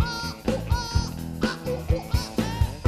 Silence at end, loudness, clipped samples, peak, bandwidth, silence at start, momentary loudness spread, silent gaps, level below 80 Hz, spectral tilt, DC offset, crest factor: 0 s; -28 LUFS; under 0.1%; -8 dBFS; 14.5 kHz; 0 s; 3 LU; none; -32 dBFS; -5.5 dB/octave; under 0.1%; 18 dB